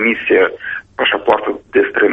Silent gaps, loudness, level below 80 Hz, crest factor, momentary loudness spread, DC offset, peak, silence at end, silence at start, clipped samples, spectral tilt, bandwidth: none; -15 LUFS; -52 dBFS; 14 dB; 7 LU; under 0.1%; 0 dBFS; 0 s; 0 s; under 0.1%; -6 dB/octave; 5.4 kHz